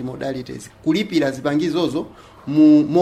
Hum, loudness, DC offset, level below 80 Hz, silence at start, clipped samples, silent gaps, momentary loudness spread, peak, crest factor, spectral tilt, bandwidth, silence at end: none; -18 LUFS; under 0.1%; -54 dBFS; 0 s; under 0.1%; none; 19 LU; -4 dBFS; 14 dB; -6.5 dB/octave; 10 kHz; 0 s